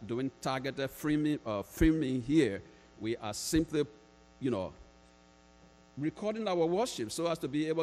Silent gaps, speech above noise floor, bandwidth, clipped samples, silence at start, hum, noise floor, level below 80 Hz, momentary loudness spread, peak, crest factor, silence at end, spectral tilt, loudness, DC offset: none; 28 dB; 15.5 kHz; under 0.1%; 0 s; none; -61 dBFS; -50 dBFS; 9 LU; -14 dBFS; 20 dB; 0 s; -5.5 dB/octave; -33 LUFS; under 0.1%